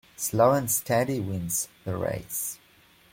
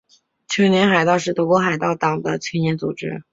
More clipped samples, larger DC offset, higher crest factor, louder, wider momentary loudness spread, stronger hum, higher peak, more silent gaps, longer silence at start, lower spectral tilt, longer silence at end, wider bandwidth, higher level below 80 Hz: neither; neither; about the same, 20 dB vs 18 dB; second, -26 LUFS vs -19 LUFS; about the same, 10 LU vs 10 LU; neither; second, -6 dBFS vs -2 dBFS; neither; second, 0.2 s vs 0.5 s; about the same, -4.5 dB/octave vs -5.5 dB/octave; first, 0.55 s vs 0.1 s; first, 16.5 kHz vs 7.8 kHz; about the same, -58 dBFS vs -60 dBFS